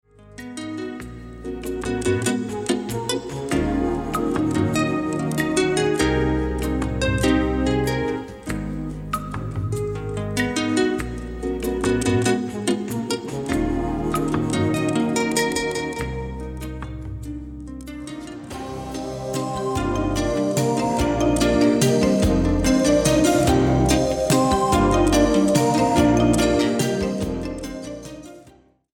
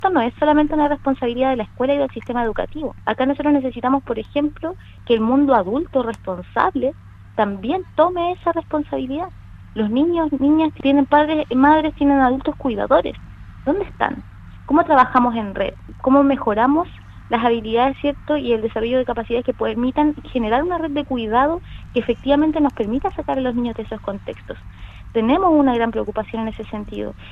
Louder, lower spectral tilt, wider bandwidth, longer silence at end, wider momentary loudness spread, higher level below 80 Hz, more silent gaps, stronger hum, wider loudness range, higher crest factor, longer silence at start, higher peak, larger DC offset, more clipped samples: about the same, -21 LUFS vs -19 LUFS; second, -5.5 dB/octave vs -8 dB/octave; first, 18.5 kHz vs 4.8 kHz; first, 0.5 s vs 0 s; about the same, 15 LU vs 13 LU; first, -34 dBFS vs -40 dBFS; neither; neither; first, 8 LU vs 4 LU; about the same, 18 dB vs 18 dB; first, 0.25 s vs 0 s; second, -4 dBFS vs 0 dBFS; neither; neither